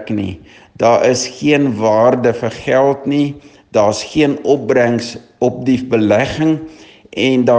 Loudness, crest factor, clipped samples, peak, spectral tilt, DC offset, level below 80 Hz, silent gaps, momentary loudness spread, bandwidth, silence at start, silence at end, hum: -14 LUFS; 14 dB; under 0.1%; 0 dBFS; -5.5 dB/octave; under 0.1%; -48 dBFS; none; 9 LU; 9.8 kHz; 0 s; 0 s; none